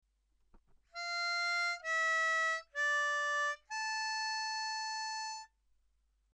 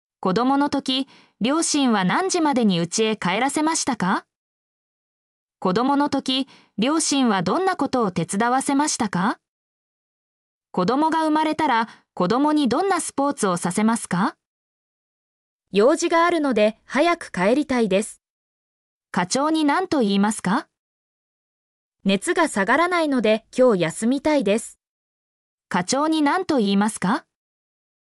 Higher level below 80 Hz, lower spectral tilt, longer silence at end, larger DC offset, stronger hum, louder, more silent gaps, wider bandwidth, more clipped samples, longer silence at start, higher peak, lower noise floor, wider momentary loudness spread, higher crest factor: second, -76 dBFS vs -62 dBFS; second, 3.5 dB/octave vs -4.5 dB/octave; about the same, 0.9 s vs 0.85 s; neither; neither; second, -34 LUFS vs -21 LUFS; second, none vs 4.36-5.48 s, 9.48-10.61 s, 14.46-15.59 s, 18.30-19.01 s, 20.79-21.92 s, 24.87-25.58 s; about the same, 12.5 kHz vs 13.5 kHz; neither; first, 0.55 s vs 0.2 s; second, -26 dBFS vs -8 dBFS; second, -75 dBFS vs under -90 dBFS; first, 9 LU vs 6 LU; about the same, 12 dB vs 14 dB